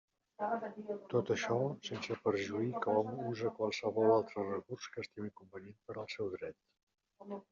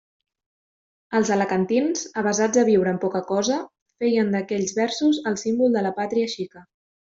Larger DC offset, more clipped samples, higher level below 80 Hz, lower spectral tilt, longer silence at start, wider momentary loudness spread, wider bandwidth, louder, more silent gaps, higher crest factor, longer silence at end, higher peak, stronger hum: neither; neither; second, -80 dBFS vs -66 dBFS; about the same, -5 dB/octave vs -4.5 dB/octave; second, 0.4 s vs 1.1 s; first, 15 LU vs 7 LU; about the same, 7.4 kHz vs 7.8 kHz; second, -37 LUFS vs -22 LUFS; about the same, 6.83-6.87 s vs 3.82-3.86 s; about the same, 20 dB vs 16 dB; second, 0.1 s vs 0.4 s; second, -18 dBFS vs -6 dBFS; neither